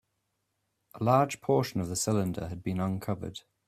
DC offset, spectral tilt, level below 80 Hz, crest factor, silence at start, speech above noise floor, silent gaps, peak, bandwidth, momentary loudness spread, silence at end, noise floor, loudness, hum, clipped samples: under 0.1%; -5.5 dB/octave; -60 dBFS; 20 dB; 0.95 s; 50 dB; none; -10 dBFS; 15.5 kHz; 10 LU; 0.3 s; -80 dBFS; -30 LUFS; none; under 0.1%